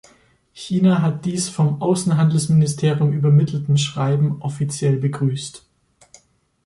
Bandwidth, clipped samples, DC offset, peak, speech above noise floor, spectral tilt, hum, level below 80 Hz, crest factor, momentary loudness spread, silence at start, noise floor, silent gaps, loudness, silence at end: 11.5 kHz; under 0.1%; under 0.1%; -6 dBFS; 39 dB; -6.5 dB/octave; none; -56 dBFS; 12 dB; 8 LU; 0.55 s; -57 dBFS; none; -19 LUFS; 1.05 s